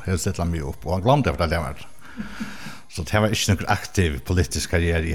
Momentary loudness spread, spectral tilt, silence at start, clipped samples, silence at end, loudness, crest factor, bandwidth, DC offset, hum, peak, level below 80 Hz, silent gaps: 15 LU; -5 dB/octave; 0 s; under 0.1%; 0 s; -23 LUFS; 18 dB; 16.5 kHz; 1%; none; -4 dBFS; -38 dBFS; none